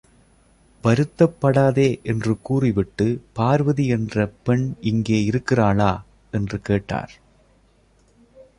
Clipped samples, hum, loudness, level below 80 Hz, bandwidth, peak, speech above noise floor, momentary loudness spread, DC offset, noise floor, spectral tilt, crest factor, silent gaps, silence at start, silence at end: under 0.1%; none; -21 LUFS; -46 dBFS; 10.5 kHz; -4 dBFS; 38 dB; 9 LU; under 0.1%; -57 dBFS; -7.5 dB/octave; 18 dB; none; 0.85 s; 1.5 s